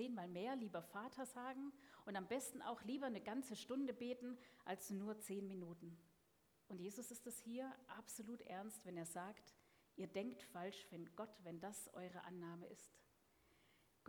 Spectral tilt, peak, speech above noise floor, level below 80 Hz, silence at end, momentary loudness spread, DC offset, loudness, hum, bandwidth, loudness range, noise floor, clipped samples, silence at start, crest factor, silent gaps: -4.5 dB/octave; -32 dBFS; 28 dB; -88 dBFS; 0.35 s; 9 LU; under 0.1%; -51 LUFS; none; 19 kHz; 5 LU; -79 dBFS; under 0.1%; 0 s; 18 dB; none